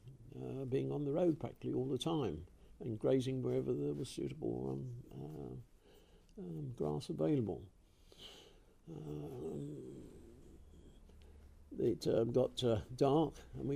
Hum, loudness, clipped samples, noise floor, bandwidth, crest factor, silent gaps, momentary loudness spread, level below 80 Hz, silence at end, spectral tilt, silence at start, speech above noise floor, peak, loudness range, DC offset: none; -39 LUFS; under 0.1%; -64 dBFS; 15 kHz; 20 dB; none; 20 LU; -62 dBFS; 0 s; -7.5 dB/octave; 0.05 s; 26 dB; -20 dBFS; 13 LU; under 0.1%